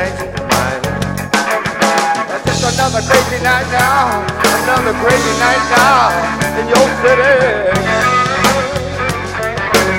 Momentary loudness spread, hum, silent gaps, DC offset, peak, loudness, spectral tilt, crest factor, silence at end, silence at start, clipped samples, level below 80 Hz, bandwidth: 8 LU; none; none; under 0.1%; 0 dBFS; -12 LUFS; -3.5 dB/octave; 12 dB; 0 s; 0 s; under 0.1%; -34 dBFS; over 20 kHz